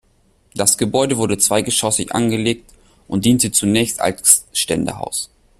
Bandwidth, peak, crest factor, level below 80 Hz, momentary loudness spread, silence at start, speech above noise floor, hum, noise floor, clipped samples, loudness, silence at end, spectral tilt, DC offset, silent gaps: 16 kHz; 0 dBFS; 18 dB; -48 dBFS; 11 LU; 0.55 s; 40 dB; none; -57 dBFS; under 0.1%; -16 LUFS; 0.35 s; -3 dB/octave; under 0.1%; none